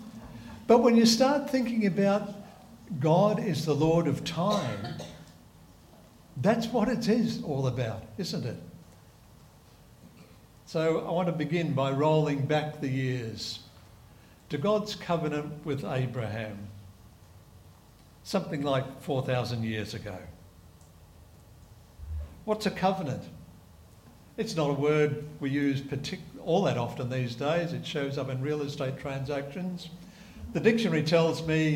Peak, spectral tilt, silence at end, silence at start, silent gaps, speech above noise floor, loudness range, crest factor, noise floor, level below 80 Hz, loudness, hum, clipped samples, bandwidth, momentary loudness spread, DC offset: -10 dBFS; -6 dB/octave; 0 s; 0 s; none; 27 dB; 8 LU; 20 dB; -55 dBFS; -56 dBFS; -29 LUFS; none; under 0.1%; 17 kHz; 17 LU; under 0.1%